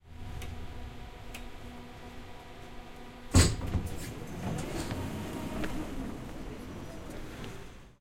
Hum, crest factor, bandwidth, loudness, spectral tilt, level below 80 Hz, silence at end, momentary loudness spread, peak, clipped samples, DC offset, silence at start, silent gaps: none; 26 dB; 16.5 kHz; -35 LUFS; -4.5 dB/octave; -44 dBFS; 0.05 s; 20 LU; -10 dBFS; under 0.1%; under 0.1%; 0.05 s; none